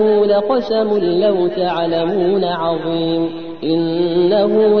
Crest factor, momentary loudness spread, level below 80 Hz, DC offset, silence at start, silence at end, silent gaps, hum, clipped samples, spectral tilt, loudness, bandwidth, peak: 12 dB; 6 LU; -54 dBFS; 1%; 0 s; 0 s; none; none; under 0.1%; -8.5 dB/octave; -16 LUFS; 5.8 kHz; -4 dBFS